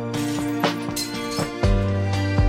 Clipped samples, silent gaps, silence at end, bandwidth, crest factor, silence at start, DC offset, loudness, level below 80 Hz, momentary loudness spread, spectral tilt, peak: under 0.1%; none; 0 s; 16.5 kHz; 14 dB; 0 s; under 0.1%; -24 LUFS; -30 dBFS; 4 LU; -5.5 dB/octave; -8 dBFS